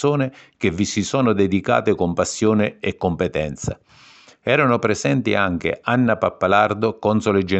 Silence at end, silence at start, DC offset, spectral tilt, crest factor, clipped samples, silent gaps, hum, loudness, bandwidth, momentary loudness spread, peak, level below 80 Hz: 0 s; 0 s; under 0.1%; -5.5 dB/octave; 18 dB; under 0.1%; none; none; -20 LUFS; 8.6 kHz; 7 LU; -2 dBFS; -48 dBFS